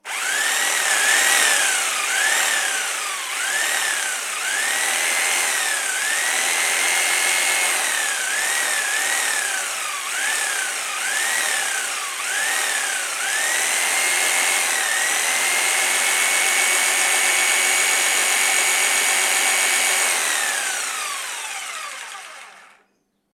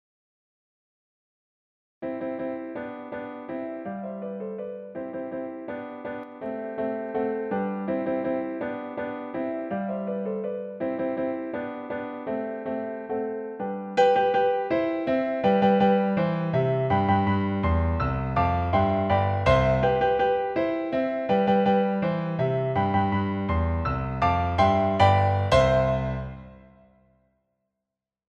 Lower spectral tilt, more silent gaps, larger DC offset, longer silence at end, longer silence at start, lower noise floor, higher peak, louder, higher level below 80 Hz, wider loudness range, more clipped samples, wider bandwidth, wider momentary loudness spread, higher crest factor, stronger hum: second, 3.5 dB/octave vs -8 dB/octave; neither; neither; second, 0.7 s vs 1.7 s; second, 0.05 s vs 2 s; second, -68 dBFS vs -87 dBFS; about the same, -4 dBFS vs -6 dBFS; first, -18 LUFS vs -26 LUFS; second, -84 dBFS vs -42 dBFS; second, 5 LU vs 12 LU; neither; first, 19.5 kHz vs 9.2 kHz; second, 7 LU vs 14 LU; about the same, 18 dB vs 20 dB; neither